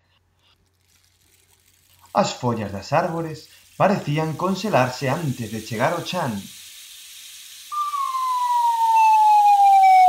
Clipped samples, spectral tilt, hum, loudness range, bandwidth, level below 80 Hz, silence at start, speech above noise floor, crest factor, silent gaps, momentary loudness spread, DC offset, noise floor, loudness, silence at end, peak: under 0.1%; -5 dB/octave; none; 8 LU; 16 kHz; -64 dBFS; 2.15 s; 39 dB; 16 dB; none; 24 LU; under 0.1%; -62 dBFS; -20 LUFS; 0 s; -4 dBFS